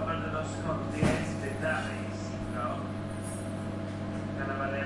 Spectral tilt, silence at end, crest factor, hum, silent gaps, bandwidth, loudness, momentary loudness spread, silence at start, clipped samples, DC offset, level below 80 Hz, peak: -6 dB/octave; 0 s; 18 dB; none; none; 11.5 kHz; -33 LUFS; 7 LU; 0 s; under 0.1%; under 0.1%; -50 dBFS; -14 dBFS